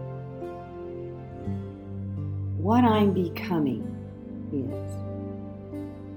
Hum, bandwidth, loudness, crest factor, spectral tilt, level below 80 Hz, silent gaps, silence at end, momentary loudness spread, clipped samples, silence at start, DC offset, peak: none; 18 kHz; -29 LUFS; 20 dB; -8.5 dB/octave; -54 dBFS; none; 0 s; 17 LU; under 0.1%; 0 s; under 0.1%; -10 dBFS